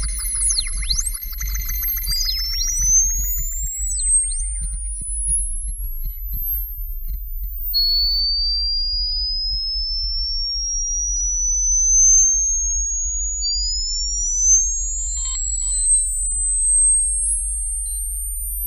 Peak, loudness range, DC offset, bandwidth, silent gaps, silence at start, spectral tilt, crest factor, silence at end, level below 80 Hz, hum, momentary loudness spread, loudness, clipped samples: -6 dBFS; 6 LU; under 0.1%; 15.5 kHz; none; 0 s; 2 dB/octave; 14 dB; 0 s; -26 dBFS; none; 13 LU; -18 LUFS; under 0.1%